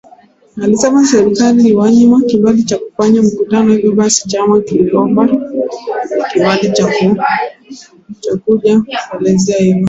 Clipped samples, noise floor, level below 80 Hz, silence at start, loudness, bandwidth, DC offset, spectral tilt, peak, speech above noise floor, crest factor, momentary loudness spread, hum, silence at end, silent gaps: under 0.1%; -43 dBFS; -50 dBFS; 0.55 s; -11 LUFS; 8 kHz; under 0.1%; -5.5 dB/octave; 0 dBFS; 33 dB; 10 dB; 10 LU; none; 0 s; none